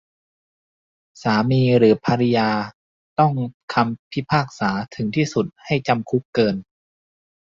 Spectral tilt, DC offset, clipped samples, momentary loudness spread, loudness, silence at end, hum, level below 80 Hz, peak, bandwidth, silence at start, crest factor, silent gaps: -7 dB/octave; under 0.1%; under 0.1%; 10 LU; -20 LUFS; 0.85 s; none; -56 dBFS; -2 dBFS; 7.6 kHz; 1.2 s; 18 dB; 2.74-3.16 s, 3.54-3.68 s, 3.99-4.11 s, 6.25-6.33 s